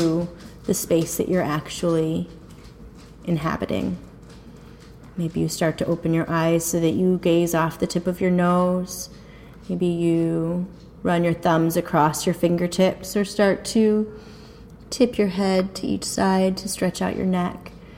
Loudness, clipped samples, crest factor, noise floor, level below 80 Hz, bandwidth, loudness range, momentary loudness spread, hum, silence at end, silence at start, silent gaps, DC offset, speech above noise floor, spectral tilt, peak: -22 LUFS; under 0.1%; 16 dB; -43 dBFS; -48 dBFS; 16.5 kHz; 6 LU; 12 LU; none; 0 s; 0 s; none; under 0.1%; 22 dB; -5.5 dB/octave; -6 dBFS